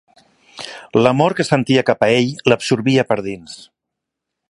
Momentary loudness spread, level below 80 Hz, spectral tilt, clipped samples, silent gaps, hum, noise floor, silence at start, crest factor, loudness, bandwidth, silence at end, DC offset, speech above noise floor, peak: 17 LU; -56 dBFS; -5.5 dB/octave; under 0.1%; none; none; -80 dBFS; 0.55 s; 18 dB; -16 LUFS; 11.5 kHz; 0.95 s; under 0.1%; 65 dB; 0 dBFS